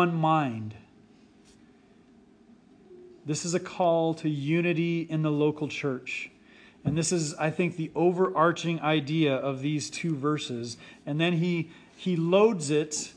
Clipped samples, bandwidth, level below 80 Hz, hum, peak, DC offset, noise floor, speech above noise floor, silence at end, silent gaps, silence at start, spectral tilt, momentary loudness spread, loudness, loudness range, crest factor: under 0.1%; 10.5 kHz; -66 dBFS; none; -10 dBFS; under 0.1%; -57 dBFS; 31 dB; 0.05 s; none; 0 s; -5.5 dB/octave; 11 LU; -27 LUFS; 5 LU; 18 dB